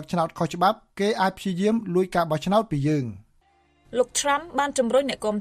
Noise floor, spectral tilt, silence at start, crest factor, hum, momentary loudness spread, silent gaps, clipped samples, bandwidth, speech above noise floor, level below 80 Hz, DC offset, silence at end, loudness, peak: -62 dBFS; -5 dB/octave; 0 s; 18 dB; none; 4 LU; none; under 0.1%; 14 kHz; 39 dB; -54 dBFS; under 0.1%; 0 s; -24 LUFS; -8 dBFS